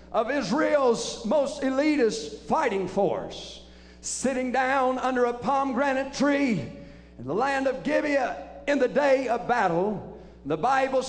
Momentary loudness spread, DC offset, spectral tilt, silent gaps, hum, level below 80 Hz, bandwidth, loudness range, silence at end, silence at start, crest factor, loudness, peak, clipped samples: 13 LU; under 0.1%; -4.5 dB/octave; none; none; -54 dBFS; 10.5 kHz; 2 LU; 0 s; 0 s; 16 dB; -25 LUFS; -10 dBFS; under 0.1%